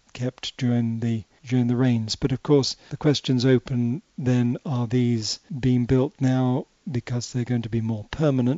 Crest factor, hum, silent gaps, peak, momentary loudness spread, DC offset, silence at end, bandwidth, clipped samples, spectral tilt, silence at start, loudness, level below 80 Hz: 16 dB; none; none; -6 dBFS; 8 LU; under 0.1%; 0 s; 8 kHz; under 0.1%; -7 dB/octave; 0.15 s; -24 LUFS; -50 dBFS